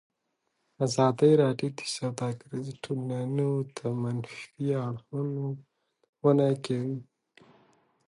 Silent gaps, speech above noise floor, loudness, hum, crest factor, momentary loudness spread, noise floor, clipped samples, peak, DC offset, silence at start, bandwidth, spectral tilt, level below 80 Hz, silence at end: 6.09-6.13 s; 51 dB; -29 LUFS; none; 20 dB; 14 LU; -79 dBFS; under 0.1%; -10 dBFS; under 0.1%; 0.8 s; 11.5 kHz; -6.5 dB/octave; -72 dBFS; 1.05 s